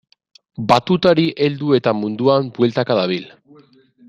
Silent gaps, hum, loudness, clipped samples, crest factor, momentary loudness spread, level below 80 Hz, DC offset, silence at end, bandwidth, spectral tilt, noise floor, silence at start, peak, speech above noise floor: none; none; -17 LUFS; under 0.1%; 18 dB; 8 LU; -56 dBFS; under 0.1%; 0.8 s; 11 kHz; -7 dB/octave; -49 dBFS; 0.6 s; 0 dBFS; 33 dB